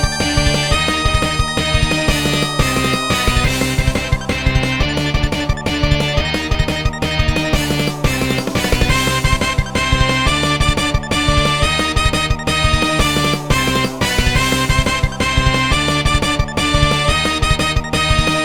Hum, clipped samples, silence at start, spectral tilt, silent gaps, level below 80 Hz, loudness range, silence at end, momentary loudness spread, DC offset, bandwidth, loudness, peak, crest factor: none; under 0.1%; 0 s; -4 dB/octave; none; -22 dBFS; 2 LU; 0 s; 3 LU; 1%; 19.5 kHz; -15 LUFS; 0 dBFS; 16 dB